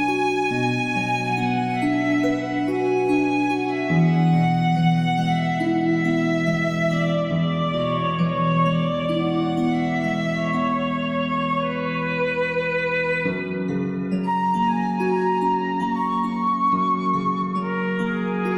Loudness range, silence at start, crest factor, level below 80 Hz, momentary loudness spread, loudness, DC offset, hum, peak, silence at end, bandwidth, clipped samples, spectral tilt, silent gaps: 3 LU; 0 s; 14 dB; -54 dBFS; 4 LU; -22 LUFS; under 0.1%; none; -8 dBFS; 0 s; 9.8 kHz; under 0.1%; -7 dB/octave; none